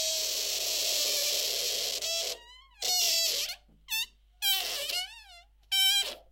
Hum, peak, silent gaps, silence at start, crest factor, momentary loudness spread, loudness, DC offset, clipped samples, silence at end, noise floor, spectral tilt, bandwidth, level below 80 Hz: none; -12 dBFS; none; 0 s; 18 dB; 10 LU; -28 LUFS; under 0.1%; under 0.1%; 0.15 s; -55 dBFS; 3 dB/octave; 16 kHz; -62 dBFS